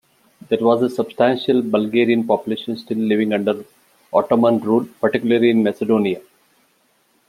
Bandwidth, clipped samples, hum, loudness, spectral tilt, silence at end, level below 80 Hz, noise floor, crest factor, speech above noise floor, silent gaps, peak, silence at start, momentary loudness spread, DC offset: 14 kHz; under 0.1%; none; -18 LUFS; -7 dB/octave; 1.1 s; -64 dBFS; -61 dBFS; 16 dB; 44 dB; none; -2 dBFS; 0.5 s; 8 LU; under 0.1%